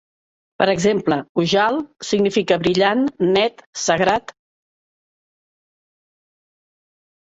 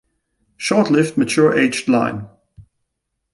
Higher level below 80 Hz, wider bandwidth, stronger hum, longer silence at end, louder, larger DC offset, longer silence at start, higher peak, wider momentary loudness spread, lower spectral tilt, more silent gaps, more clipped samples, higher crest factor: about the same, -56 dBFS vs -56 dBFS; second, 8 kHz vs 11.5 kHz; neither; first, 3.2 s vs 0.7 s; about the same, -18 LUFS vs -17 LUFS; neither; about the same, 0.6 s vs 0.6 s; about the same, -4 dBFS vs -2 dBFS; second, 6 LU vs 9 LU; about the same, -4.5 dB/octave vs -5 dB/octave; first, 1.29-1.35 s, 3.66-3.73 s vs none; neither; about the same, 18 dB vs 18 dB